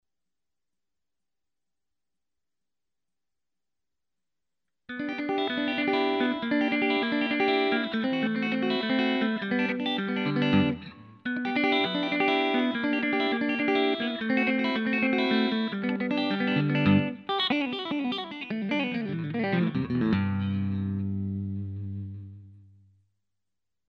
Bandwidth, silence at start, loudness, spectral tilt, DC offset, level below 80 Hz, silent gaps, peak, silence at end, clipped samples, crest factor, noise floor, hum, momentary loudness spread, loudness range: 6.4 kHz; 4.9 s; -27 LUFS; -7.5 dB/octave; under 0.1%; -66 dBFS; none; -10 dBFS; 1.3 s; under 0.1%; 18 dB; under -90 dBFS; none; 9 LU; 6 LU